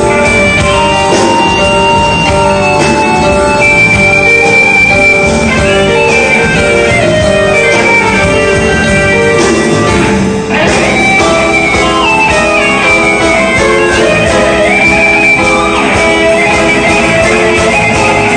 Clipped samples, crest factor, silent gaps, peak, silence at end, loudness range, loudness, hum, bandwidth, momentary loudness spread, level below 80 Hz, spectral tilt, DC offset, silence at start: 0.6%; 8 dB; none; 0 dBFS; 0 s; 2 LU; -6 LUFS; none; 11 kHz; 4 LU; -24 dBFS; -4 dB/octave; 0.6%; 0 s